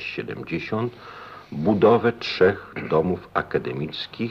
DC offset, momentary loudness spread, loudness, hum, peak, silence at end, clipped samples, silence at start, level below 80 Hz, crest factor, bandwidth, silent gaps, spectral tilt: under 0.1%; 14 LU; -23 LUFS; none; -6 dBFS; 0 s; under 0.1%; 0 s; -54 dBFS; 18 dB; 6.8 kHz; none; -7.5 dB/octave